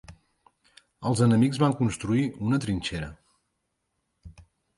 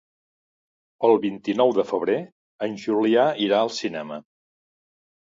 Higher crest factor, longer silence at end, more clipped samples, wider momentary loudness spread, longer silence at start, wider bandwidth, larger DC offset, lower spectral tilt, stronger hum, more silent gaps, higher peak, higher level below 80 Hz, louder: about the same, 20 dB vs 18 dB; second, 0.35 s vs 1 s; neither; about the same, 12 LU vs 13 LU; second, 0.1 s vs 1 s; first, 11.5 kHz vs 7.8 kHz; neither; about the same, -6.5 dB/octave vs -5.5 dB/octave; neither; second, none vs 2.32-2.59 s; about the same, -8 dBFS vs -6 dBFS; first, -52 dBFS vs -72 dBFS; second, -25 LUFS vs -22 LUFS